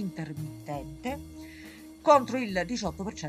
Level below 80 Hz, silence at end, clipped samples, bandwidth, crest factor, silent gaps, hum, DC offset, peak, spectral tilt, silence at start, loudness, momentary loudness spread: -52 dBFS; 0 s; under 0.1%; 15.5 kHz; 24 dB; none; none; under 0.1%; -8 dBFS; -5.5 dB/octave; 0 s; -29 LUFS; 22 LU